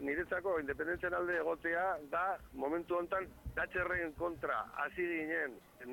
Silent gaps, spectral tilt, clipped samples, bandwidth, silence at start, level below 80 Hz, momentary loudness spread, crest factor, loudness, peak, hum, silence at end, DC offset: none; -6.5 dB/octave; under 0.1%; 17.5 kHz; 0 s; -60 dBFS; 5 LU; 14 dB; -37 LUFS; -24 dBFS; none; 0 s; under 0.1%